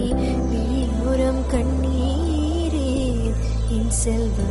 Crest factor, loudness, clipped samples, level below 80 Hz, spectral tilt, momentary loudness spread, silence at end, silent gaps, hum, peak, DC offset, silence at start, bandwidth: 12 dB; -22 LUFS; under 0.1%; -24 dBFS; -6 dB/octave; 2 LU; 0 s; none; none; -8 dBFS; under 0.1%; 0 s; 11.5 kHz